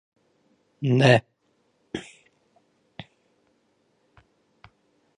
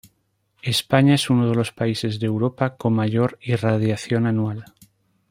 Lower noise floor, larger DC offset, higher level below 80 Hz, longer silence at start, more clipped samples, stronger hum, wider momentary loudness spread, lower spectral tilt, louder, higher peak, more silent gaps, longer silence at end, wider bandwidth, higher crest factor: about the same, -69 dBFS vs -68 dBFS; neither; second, -66 dBFS vs -58 dBFS; first, 0.8 s vs 0.65 s; neither; neither; first, 28 LU vs 7 LU; about the same, -6.5 dB/octave vs -6 dB/octave; about the same, -22 LUFS vs -21 LUFS; about the same, -4 dBFS vs -2 dBFS; neither; first, 3.15 s vs 0.7 s; second, 10.5 kHz vs 16 kHz; first, 26 dB vs 18 dB